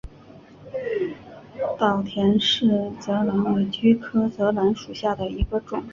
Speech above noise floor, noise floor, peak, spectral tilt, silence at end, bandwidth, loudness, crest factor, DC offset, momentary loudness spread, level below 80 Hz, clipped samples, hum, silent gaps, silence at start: 25 dB; -47 dBFS; -6 dBFS; -6.5 dB/octave; 0 s; 7.4 kHz; -23 LUFS; 18 dB; under 0.1%; 11 LU; -42 dBFS; under 0.1%; none; none; 0.05 s